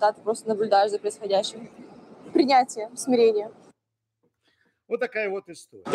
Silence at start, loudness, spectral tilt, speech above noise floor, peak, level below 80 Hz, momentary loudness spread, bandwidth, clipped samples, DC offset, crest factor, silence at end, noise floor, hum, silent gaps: 0 s; -24 LUFS; -3.5 dB/octave; 58 dB; -8 dBFS; -78 dBFS; 19 LU; 12.5 kHz; under 0.1%; under 0.1%; 18 dB; 0 s; -82 dBFS; none; none